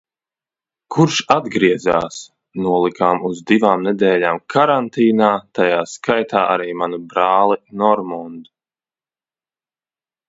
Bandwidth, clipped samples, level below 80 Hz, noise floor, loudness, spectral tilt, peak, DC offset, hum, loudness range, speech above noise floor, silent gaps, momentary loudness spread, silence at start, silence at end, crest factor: 8 kHz; under 0.1%; -58 dBFS; under -90 dBFS; -16 LUFS; -5.5 dB/octave; 0 dBFS; under 0.1%; none; 4 LU; over 74 dB; none; 9 LU; 0.9 s; 1.85 s; 18 dB